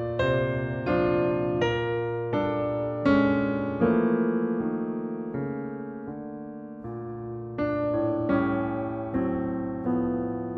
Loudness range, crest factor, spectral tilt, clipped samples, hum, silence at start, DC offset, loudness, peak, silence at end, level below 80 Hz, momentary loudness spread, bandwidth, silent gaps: 7 LU; 18 dB; -8.5 dB/octave; under 0.1%; none; 0 s; under 0.1%; -27 LUFS; -10 dBFS; 0 s; -52 dBFS; 13 LU; 7 kHz; none